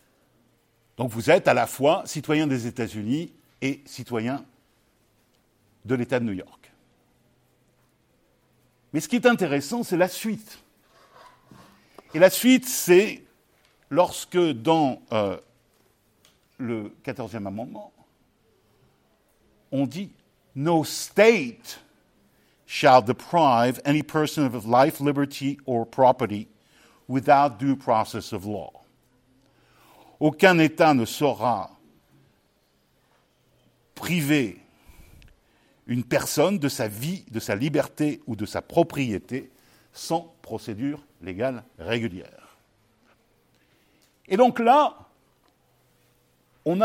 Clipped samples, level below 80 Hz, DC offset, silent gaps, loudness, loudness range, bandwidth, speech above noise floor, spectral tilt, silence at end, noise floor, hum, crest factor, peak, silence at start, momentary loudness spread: under 0.1%; -66 dBFS; under 0.1%; none; -23 LUFS; 11 LU; 16.5 kHz; 43 dB; -5 dB/octave; 0 s; -66 dBFS; none; 22 dB; -2 dBFS; 1 s; 17 LU